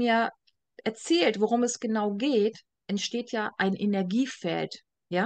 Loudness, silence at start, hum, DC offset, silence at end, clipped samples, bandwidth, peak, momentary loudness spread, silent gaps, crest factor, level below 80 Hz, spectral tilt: -28 LUFS; 0 s; none; under 0.1%; 0 s; under 0.1%; 9.6 kHz; -10 dBFS; 10 LU; none; 16 dB; -78 dBFS; -4.5 dB/octave